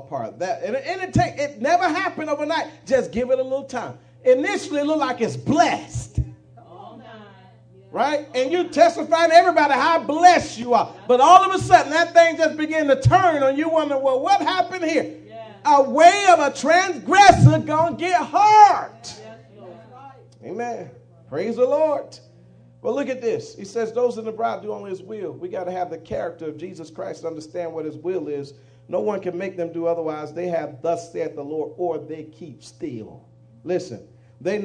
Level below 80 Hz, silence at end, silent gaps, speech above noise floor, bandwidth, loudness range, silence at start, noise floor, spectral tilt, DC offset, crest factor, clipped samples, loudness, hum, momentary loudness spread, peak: -48 dBFS; 0 s; none; 30 dB; 10 kHz; 13 LU; 0 s; -49 dBFS; -5 dB/octave; under 0.1%; 20 dB; under 0.1%; -19 LUFS; none; 19 LU; 0 dBFS